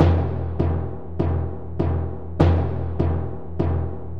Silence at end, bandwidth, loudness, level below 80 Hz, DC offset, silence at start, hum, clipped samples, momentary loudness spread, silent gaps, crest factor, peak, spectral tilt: 0 s; 5.2 kHz; -24 LUFS; -32 dBFS; 2%; 0 s; none; under 0.1%; 10 LU; none; 18 dB; -4 dBFS; -10 dB/octave